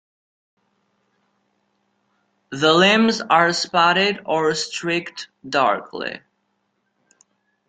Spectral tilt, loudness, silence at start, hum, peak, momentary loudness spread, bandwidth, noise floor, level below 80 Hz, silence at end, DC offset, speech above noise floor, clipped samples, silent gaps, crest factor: -3.5 dB/octave; -18 LUFS; 2.5 s; none; -2 dBFS; 16 LU; 9.4 kHz; -71 dBFS; -66 dBFS; 1.5 s; under 0.1%; 52 dB; under 0.1%; none; 20 dB